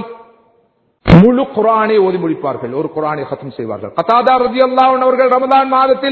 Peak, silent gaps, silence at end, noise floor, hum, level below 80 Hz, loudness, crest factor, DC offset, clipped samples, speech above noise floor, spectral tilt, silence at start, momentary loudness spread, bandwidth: 0 dBFS; none; 0 s; -57 dBFS; none; -34 dBFS; -12 LUFS; 12 dB; under 0.1%; 0.8%; 44 dB; -9 dB/octave; 0 s; 14 LU; 6.2 kHz